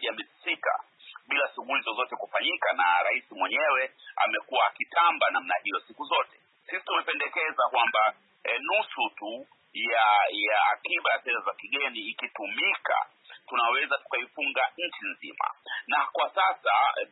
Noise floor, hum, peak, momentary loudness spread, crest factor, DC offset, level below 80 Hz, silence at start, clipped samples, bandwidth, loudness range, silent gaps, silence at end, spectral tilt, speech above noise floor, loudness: -50 dBFS; none; -10 dBFS; 10 LU; 18 dB; under 0.1%; under -90 dBFS; 0 s; under 0.1%; 4.1 kHz; 3 LU; none; 0.05 s; -4.5 dB/octave; 23 dB; -27 LUFS